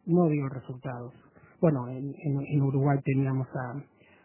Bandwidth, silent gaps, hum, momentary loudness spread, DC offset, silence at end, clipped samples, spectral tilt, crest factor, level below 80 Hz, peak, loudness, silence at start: 3.1 kHz; none; none; 13 LU; under 0.1%; 0.45 s; under 0.1%; -13.5 dB/octave; 18 dB; -64 dBFS; -10 dBFS; -29 LUFS; 0.05 s